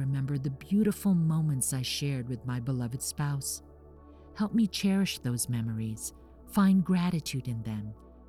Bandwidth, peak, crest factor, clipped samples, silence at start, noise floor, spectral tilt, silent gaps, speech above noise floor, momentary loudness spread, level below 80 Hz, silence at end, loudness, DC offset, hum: 16 kHz; -14 dBFS; 16 dB; under 0.1%; 0 s; -52 dBFS; -5.5 dB/octave; none; 23 dB; 10 LU; -54 dBFS; 0.05 s; -30 LUFS; under 0.1%; none